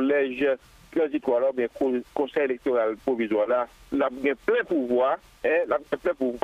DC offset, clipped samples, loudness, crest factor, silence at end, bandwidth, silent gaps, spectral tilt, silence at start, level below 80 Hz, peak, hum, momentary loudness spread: under 0.1%; under 0.1%; -26 LUFS; 16 dB; 0.05 s; 12 kHz; none; -6 dB/octave; 0 s; -60 dBFS; -10 dBFS; none; 4 LU